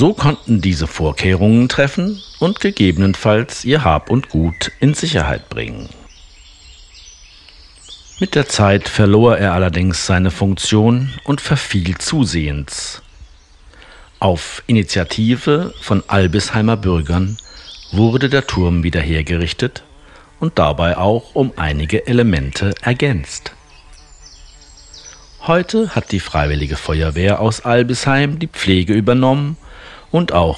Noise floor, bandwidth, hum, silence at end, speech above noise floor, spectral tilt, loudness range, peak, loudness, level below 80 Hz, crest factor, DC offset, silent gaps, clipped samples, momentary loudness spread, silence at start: -44 dBFS; 11 kHz; none; 0 s; 29 dB; -6 dB/octave; 6 LU; 0 dBFS; -15 LUFS; -34 dBFS; 16 dB; under 0.1%; none; under 0.1%; 10 LU; 0 s